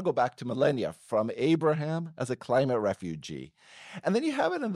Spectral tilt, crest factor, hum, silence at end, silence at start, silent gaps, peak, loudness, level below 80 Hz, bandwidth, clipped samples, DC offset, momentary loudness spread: -6.5 dB/octave; 16 dB; none; 0 s; 0 s; none; -12 dBFS; -29 LUFS; -68 dBFS; 12 kHz; under 0.1%; under 0.1%; 13 LU